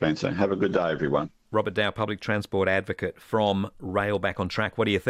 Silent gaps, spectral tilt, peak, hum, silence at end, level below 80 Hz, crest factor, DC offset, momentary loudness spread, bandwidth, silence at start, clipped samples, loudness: none; -6.5 dB/octave; -10 dBFS; none; 0 s; -54 dBFS; 16 dB; under 0.1%; 5 LU; 14.5 kHz; 0 s; under 0.1%; -26 LUFS